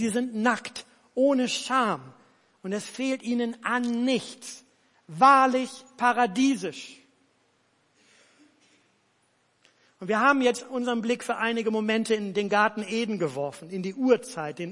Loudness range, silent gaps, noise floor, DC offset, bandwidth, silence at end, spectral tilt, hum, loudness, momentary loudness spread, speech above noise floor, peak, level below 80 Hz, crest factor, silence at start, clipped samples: 6 LU; none; -68 dBFS; under 0.1%; 11.5 kHz; 0 s; -4 dB/octave; none; -25 LUFS; 15 LU; 43 dB; -6 dBFS; -78 dBFS; 20 dB; 0 s; under 0.1%